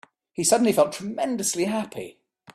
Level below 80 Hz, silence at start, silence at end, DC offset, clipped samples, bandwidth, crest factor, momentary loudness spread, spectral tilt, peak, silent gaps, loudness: -66 dBFS; 0.4 s; 0.05 s; under 0.1%; under 0.1%; 15 kHz; 18 dB; 19 LU; -3.5 dB/octave; -6 dBFS; none; -23 LUFS